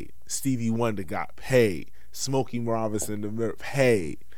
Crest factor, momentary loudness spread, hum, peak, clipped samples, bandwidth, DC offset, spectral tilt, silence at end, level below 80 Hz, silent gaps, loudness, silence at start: 20 dB; 11 LU; none; -8 dBFS; under 0.1%; 17.5 kHz; 2%; -5 dB/octave; 0.2 s; -54 dBFS; none; -27 LUFS; 0 s